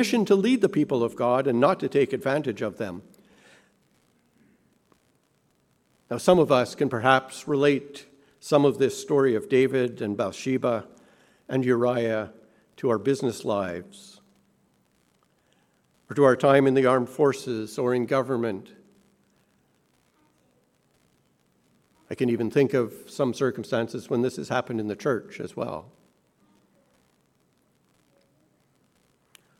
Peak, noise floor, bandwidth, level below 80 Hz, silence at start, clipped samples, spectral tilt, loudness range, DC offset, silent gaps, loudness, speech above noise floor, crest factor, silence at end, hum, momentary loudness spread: -4 dBFS; -68 dBFS; 14.5 kHz; -68 dBFS; 0 s; under 0.1%; -6 dB/octave; 11 LU; under 0.1%; none; -24 LUFS; 44 dB; 24 dB; 3.8 s; none; 13 LU